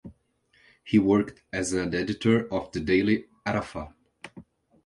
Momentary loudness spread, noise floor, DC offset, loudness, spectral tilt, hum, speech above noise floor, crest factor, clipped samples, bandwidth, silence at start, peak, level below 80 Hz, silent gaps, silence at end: 22 LU; -66 dBFS; under 0.1%; -26 LUFS; -6 dB/octave; none; 40 dB; 18 dB; under 0.1%; 11 kHz; 0.05 s; -8 dBFS; -52 dBFS; none; 0.45 s